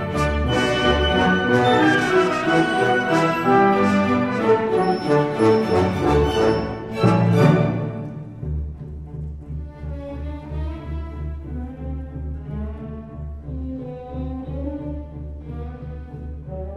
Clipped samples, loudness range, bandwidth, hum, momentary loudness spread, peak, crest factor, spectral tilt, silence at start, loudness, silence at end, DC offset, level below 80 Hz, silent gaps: under 0.1%; 14 LU; 13.5 kHz; none; 17 LU; -4 dBFS; 18 dB; -6.5 dB/octave; 0 s; -20 LUFS; 0 s; under 0.1%; -34 dBFS; none